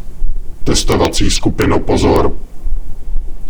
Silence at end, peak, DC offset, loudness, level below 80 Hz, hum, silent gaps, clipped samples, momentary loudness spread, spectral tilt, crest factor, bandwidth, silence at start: 0 s; 0 dBFS; under 0.1%; -14 LUFS; -18 dBFS; none; none; under 0.1%; 16 LU; -4.5 dB/octave; 12 dB; 17 kHz; 0 s